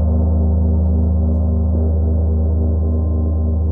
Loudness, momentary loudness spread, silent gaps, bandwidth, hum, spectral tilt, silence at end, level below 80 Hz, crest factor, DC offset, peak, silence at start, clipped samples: -17 LUFS; 2 LU; none; 1.4 kHz; none; -14.5 dB/octave; 0 s; -18 dBFS; 8 dB; under 0.1%; -6 dBFS; 0 s; under 0.1%